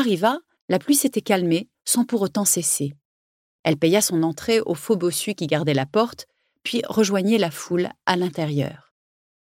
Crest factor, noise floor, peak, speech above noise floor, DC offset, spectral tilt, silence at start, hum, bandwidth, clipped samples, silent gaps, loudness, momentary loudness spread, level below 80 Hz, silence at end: 20 dB; under -90 dBFS; -2 dBFS; over 69 dB; under 0.1%; -4 dB/octave; 0 s; none; 16.5 kHz; under 0.1%; 0.61-0.68 s, 3.05-3.64 s; -22 LUFS; 8 LU; -64 dBFS; 0.7 s